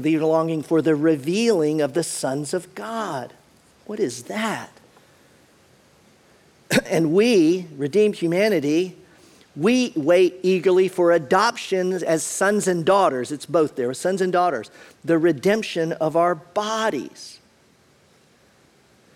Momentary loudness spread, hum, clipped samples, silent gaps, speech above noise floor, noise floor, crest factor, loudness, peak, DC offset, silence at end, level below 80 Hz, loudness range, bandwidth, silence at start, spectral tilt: 12 LU; none; under 0.1%; none; 37 dB; -57 dBFS; 18 dB; -21 LUFS; -4 dBFS; under 0.1%; 1.8 s; -66 dBFS; 9 LU; 15.5 kHz; 0 s; -5 dB/octave